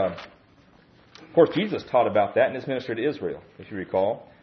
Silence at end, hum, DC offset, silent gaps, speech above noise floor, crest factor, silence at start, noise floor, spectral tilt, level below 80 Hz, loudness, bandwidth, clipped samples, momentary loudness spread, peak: 0.2 s; none; under 0.1%; none; 32 dB; 20 dB; 0 s; -56 dBFS; -7.5 dB/octave; -64 dBFS; -24 LUFS; 6.4 kHz; under 0.1%; 15 LU; -6 dBFS